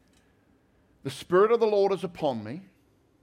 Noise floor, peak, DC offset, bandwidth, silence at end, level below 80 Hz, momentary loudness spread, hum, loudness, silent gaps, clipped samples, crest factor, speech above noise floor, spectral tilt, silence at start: -64 dBFS; -12 dBFS; under 0.1%; 14 kHz; 0.6 s; -68 dBFS; 19 LU; none; -25 LUFS; none; under 0.1%; 16 dB; 39 dB; -6 dB/octave; 1.05 s